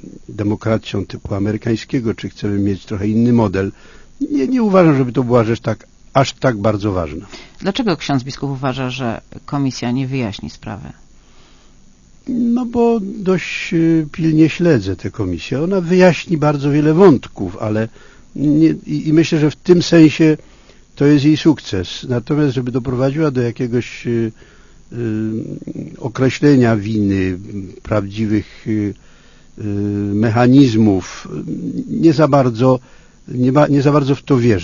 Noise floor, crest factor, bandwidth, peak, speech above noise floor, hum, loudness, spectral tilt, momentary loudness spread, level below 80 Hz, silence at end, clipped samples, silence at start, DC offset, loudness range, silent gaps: -45 dBFS; 16 dB; 7.4 kHz; 0 dBFS; 30 dB; none; -16 LUFS; -7 dB/octave; 14 LU; -42 dBFS; 0 s; under 0.1%; 0.05 s; under 0.1%; 7 LU; none